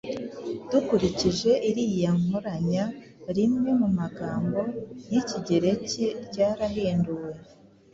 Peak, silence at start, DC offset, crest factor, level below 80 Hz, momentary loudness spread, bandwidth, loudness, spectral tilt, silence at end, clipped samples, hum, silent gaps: -10 dBFS; 0.05 s; under 0.1%; 16 dB; -54 dBFS; 11 LU; 7.8 kHz; -26 LUFS; -6.5 dB/octave; 0.5 s; under 0.1%; none; none